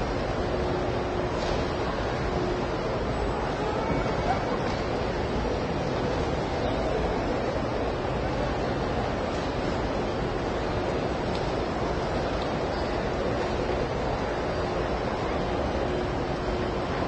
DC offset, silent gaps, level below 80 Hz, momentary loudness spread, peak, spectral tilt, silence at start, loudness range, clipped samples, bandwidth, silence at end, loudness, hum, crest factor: under 0.1%; none; -38 dBFS; 1 LU; -14 dBFS; -6.5 dB/octave; 0 s; 1 LU; under 0.1%; 8.8 kHz; 0 s; -28 LUFS; none; 14 dB